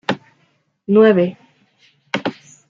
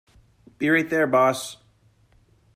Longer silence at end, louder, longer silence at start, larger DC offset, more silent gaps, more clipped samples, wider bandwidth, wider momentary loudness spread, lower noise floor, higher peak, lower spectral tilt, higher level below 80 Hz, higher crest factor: second, 0.35 s vs 1 s; first, -17 LUFS vs -21 LUFS; second, 0.1 s vs 0.6 s; neither; neither; neither; second, 7.4 kHz vs 15.5 kHz; first, 16 LU vs 12 LU; about the same, -62 dBFS vs -60 dBFS; first, -2 dBFS vs -6 dBFS; first, -7 dB/octave vs -5 dB/octave; second, -68 dBFS vs -62 dBFS; about the same, 18 dB vs 18 dB